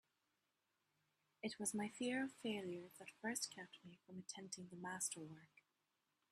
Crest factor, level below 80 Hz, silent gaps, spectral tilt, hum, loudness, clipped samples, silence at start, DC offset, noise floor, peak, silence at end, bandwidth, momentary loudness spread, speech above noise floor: 22 dB; under -90 dBFS; none; -3 dB/octave; none; -47 LUFS; under 0.1%; 1.45 s; under 0.1%; -88 dBFS; -28 dBFS; 0.85 s; 15 kHz; 15 LU; 40 dB